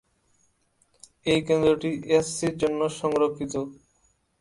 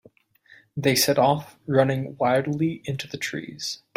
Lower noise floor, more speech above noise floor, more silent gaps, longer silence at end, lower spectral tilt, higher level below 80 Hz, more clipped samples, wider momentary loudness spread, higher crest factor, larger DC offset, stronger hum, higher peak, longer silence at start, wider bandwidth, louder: first, -67 dBFS vs -56 dBFS; first, 43 dB vs 33 dB; neither; first, 0.65 s vs 0.2 s; about the same, -5 dB/octave vs -4.5 dB/octave; first, -56 dBFS vs -62 dBFS; neither; about the same, 10 LU vs 12 LU; about the same, 18 dB vs 18 dB; neither; neither; about the same, -8 dBFS vs -6 dBFS; first, 1.25 s vs 0.75 s; second, 11.5 kHz vs 16 kHz; about the same, -25 LUFS vs -24 LUFS